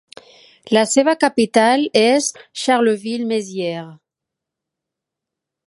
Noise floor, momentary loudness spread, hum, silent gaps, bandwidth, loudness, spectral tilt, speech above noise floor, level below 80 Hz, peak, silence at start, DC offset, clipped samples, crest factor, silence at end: -83 dBFS; 10 LU; none; none; 11.5 kHz; -17 LUFS; -3.5 dB/octave; 67 dB; -68 dBFS; 0 dBFS; 0.65 s; under 0.1%; under 0.1%; 18 dB; 1.7 s